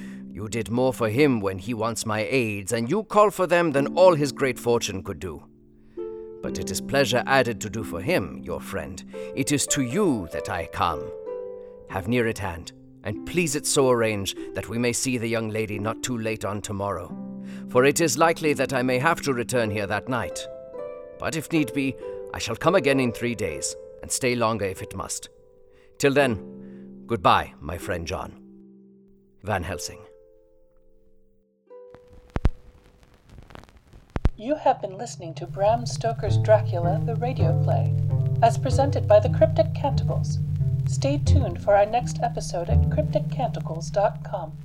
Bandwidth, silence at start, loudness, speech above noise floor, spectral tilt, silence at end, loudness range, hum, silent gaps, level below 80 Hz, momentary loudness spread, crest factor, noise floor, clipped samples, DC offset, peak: 17 kHz; 0 s; -24 LUFS; 36 dB; -5 dB/octave; 0 s; 12 LU; none; none; -42 dBFS; 15 LU; 20 dB; -60 dBFS; under 0.1%; under 0.1%; -4 dBFS